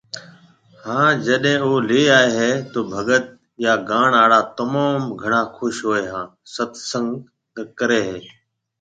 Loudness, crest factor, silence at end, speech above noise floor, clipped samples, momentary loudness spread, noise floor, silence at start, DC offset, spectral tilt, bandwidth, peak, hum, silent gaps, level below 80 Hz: -18 LUFS; 18 dB; 0.55 s; 31 dB; under 0.1%; 19 LU; -50 dBFS; 0.15 s; under 0.1%; -4.5 dB/octave; 9.4 kHz; 0 dBFS; none; none; -60 dBFS